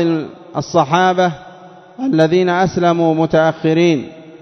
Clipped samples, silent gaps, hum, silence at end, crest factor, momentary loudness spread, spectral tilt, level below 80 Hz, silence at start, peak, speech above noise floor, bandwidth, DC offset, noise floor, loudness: under 0.1%; none; none; 0.1 s; 16 dB; 11 LU; -6.5 dB/octave; -52 dBFS; 0 s; 0 dBFS; 25 dB; 6.4 kHz; under 0.1%; -39 dBFS; -15 LUFS